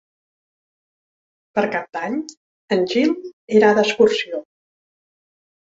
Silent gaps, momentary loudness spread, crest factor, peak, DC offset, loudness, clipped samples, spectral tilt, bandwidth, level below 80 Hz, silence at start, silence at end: 2.37-2.68 s, 3.33-3.48 s; 13 LU; 20 dB; -2 dBFS; under 0.1%; -19 LUFS; under 0.1%; -5 dB/octave; 7.8 kHz; -66 dBFS; 1.55 s; 1.35 s